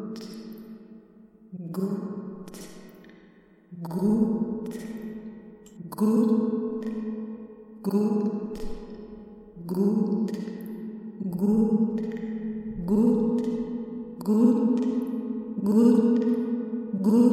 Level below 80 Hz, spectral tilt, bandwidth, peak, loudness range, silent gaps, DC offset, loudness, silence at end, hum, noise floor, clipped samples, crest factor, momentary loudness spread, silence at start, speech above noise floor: -52 dBFS; -9 dB/octave; 14 kHz; -8 dBFS; 7 LU; none; under 0.1%; -26 LUFS; 0 s; none; -55 dBFS; under 0.1%; 18 dB; 21 LU; 0 s; 30 dB